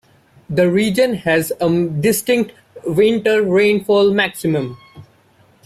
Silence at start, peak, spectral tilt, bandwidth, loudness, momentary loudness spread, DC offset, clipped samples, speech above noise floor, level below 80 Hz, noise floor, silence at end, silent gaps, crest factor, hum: 0.5 s; -4 dBFS; -5.5 dB/octave; 16 kHz; -16 LUFS; 8 LU; under 0.1%; under 0.1%; 37 dB; -54 dBFS; -53 dBFS; 0.65 s; none; 14 dB; none